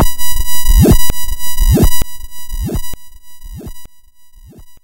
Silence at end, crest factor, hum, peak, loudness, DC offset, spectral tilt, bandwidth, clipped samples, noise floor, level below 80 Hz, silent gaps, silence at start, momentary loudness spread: 0.05 s; 10 dB; none; 0 dBFS; -15 LUFS; under 0.1%; -5 dB/octave; 16.5 kHz; under 0.1%; -40 dBFS; -16 dBFS; none; 0 s; 22 LU